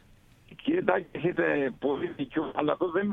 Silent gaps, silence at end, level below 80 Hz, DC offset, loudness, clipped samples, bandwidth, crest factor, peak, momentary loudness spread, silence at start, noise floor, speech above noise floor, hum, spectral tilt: none; 0 s; -62 dBFS; under 0.1%; -29 LUFS; under 0.1%; 4 kHz; 22 dB; -6 dBFS; 6 LU; 0.5 s; -57 dBFS; 29 dB; none; -8.5 dB/octave